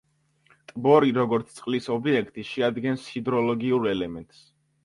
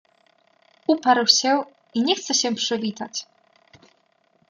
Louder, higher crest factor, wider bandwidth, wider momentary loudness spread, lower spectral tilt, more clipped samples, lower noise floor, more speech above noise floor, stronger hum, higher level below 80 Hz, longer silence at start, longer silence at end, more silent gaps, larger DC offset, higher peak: second, -25 LUFS vs -21 LUFS; about the same, 20 dB vs 22 dB; second, 11.5 kHz vs 13 kHz; second, 12 LU vs 15 LU; first, -7 dB/octave vs -2 dB/octave; neither; about the same, -63 dBFS vs -64 dBFS; second, 39 dB vs 43 dB; neither; first, -62 dBFS vs -76 dBFS; second, 0.75 s vs 0.9 s; second, 0.6 s vs 1.25 s; neither; neither; about the same, -4 dBFS vs -2 dBFS